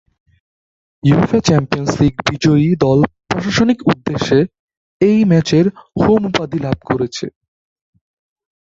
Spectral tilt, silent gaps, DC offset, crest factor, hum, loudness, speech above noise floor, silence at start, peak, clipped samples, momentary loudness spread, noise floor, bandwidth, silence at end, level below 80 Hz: -6.5 dB/octave; 4.59-4.68 s, 4.77-5.00 s; under 0.1%; 14 dB; none; -15 LUFS; over 76 dB; 1.05 s; -2 dBFS; under 0.1%; 8 LU; under -90 dBFS; 7.8 kHz; 1.35 s; -42 dBFS